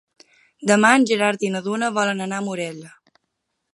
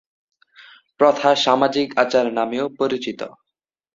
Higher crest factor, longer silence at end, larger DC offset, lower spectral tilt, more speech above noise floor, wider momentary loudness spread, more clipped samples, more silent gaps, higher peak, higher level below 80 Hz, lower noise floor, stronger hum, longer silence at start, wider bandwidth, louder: about the same, 22 dB vs 20 dB; first, 0.85 s vs 0.65 s; neither; about the same, -4 dB/octave vs -4 dB/octave; second, 57 dB vs 65 dB; first, 14 LU vs 11 LU; neither; neither; about the same, 0 dBFS vs -2 dBFS; second, -72 dBFS vs -66 dBFS; second, -76 dBFS vs -83 dBFS; neither; second, 0.6 s vs 1 s; first, 11.5 kHz vs 7.8 kHz; about the same, -20 LUFS vs -19 LUFS